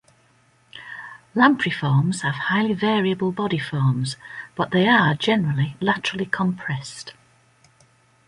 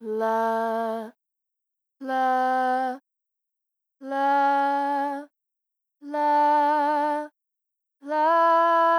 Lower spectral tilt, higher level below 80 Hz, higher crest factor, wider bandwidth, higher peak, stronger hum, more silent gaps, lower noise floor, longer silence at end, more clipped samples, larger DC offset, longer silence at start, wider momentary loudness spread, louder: first, -6 dB/octave vs -4.5 dB/octave; first, -58 dBFS vs under -90 dBFS; first, 20 dB vs 14 dB; second, 11.5 kHz vs 14.5 kHz; first, -2 dBFS vs -12 dBFS; neither; neither; second, -59 dBFS vs -84 dBFS; first, 1.15 s vs 0 s; neither; neither; first, 0.75 s vs 0 s; first, 18 LU vs 15 LU; about the same, -21 LUFS vs -23 LUFS